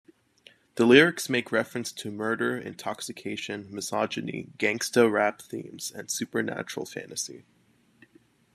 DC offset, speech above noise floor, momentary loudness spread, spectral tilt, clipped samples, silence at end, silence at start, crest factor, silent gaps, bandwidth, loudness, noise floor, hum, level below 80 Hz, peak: under 0.1%; 37 dB; 16 LU; -3.5 dB/octave; under 0.1%; 1.15 s; 0.75 s; 24 dB; none; 14 kHz; -27 LUFS; -64 dBFS; none; -74 dBFS; -4 dBFS